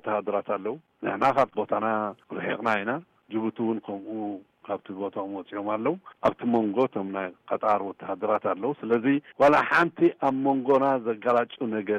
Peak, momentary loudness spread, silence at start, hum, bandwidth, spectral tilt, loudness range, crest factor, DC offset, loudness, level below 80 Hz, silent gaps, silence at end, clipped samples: -12 dBFS; 12 LU; 0.05 s; none; 10 kHz; -7 dB/octave; 7 LU; 14 dB; under 0.1%; -26 LUFS; -68 dBFS; none; 0 s; under 0.1%